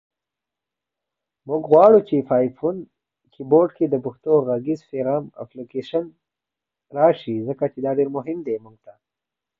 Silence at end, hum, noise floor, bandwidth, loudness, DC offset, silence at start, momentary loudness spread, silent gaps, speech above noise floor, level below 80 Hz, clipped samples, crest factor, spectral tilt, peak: 1 s; none; -87 dBFS; 5.8 kHz; -20 LUFS; under 0.1%; 1.45 s; 17 LU; none; 67 dB; -66 dBFS; under 0.1%; 20 dB; -9.5 dB/octave; -2 dBFS